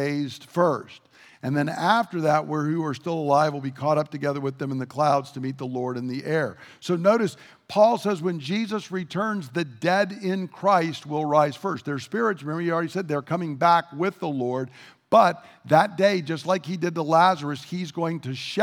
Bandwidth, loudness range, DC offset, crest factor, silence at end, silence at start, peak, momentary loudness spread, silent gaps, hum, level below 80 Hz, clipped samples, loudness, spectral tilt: 16.5 kHz; 3 LU; under 0.1%; 20 dB; 0 s; 0 s; -4 dBFS; 10 LU; none; none; -76 dBFS; under 0.1%; -24 LUFS; -6 dB/octave